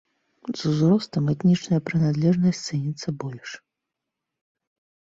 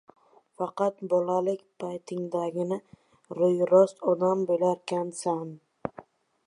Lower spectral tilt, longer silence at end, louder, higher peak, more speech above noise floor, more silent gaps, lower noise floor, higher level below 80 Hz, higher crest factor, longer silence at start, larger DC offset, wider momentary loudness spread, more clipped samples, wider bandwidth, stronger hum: about the same, -7 dB/octave vs -7 dB/octave; first, 1.5 s vs 0.45 s; first, -23 LUFS vs -27 LUFS; about the same, -10 dBFS vs -8 dBFS; first, 62 dB vs 25 dB; neither; first, -84 dBFS vs -51 dBFS; first, -60 dBFS vs -74 dBFS; about the same, 16 dB vs 20 dB; second, 0.45 s vs 0.6 s; neither; about the same, 16 LU vs 17 LU; neither; second, 7.8 kHz vs 11 kHz; neither